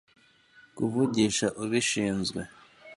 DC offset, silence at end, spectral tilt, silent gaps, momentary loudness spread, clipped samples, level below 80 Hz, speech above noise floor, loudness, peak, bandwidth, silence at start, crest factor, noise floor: under 0.1%; 0 s; -4 dB/octave; none; 9 LU; under 0.1%; -60 dBFS; 31 dB; -27 LUFS; -12 dBFS; 11.5 kHz; 0.75 s; 18 dB; -59 dBFS